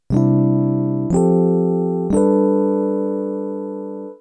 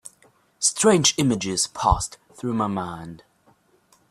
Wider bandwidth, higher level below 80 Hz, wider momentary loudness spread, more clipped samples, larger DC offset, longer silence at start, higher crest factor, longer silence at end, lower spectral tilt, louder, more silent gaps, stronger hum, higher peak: second, 9.2 kHz vs 15.5 kHz; second, -44 dBFS vs -38 dBFS; second, 11 LU vs 16 LU; neither; neither; about the same, 0.1 s vs 0.05 s; second, 14 dB vs 20 dB; second, 0.05 s vs 0.95 s; first, -10.5 dB/octave vs -3.5 dB/octave; first, -18 LUFS vs -22 LUFS; neither; neither; about the same, -4 dBFS vs -4 dBFS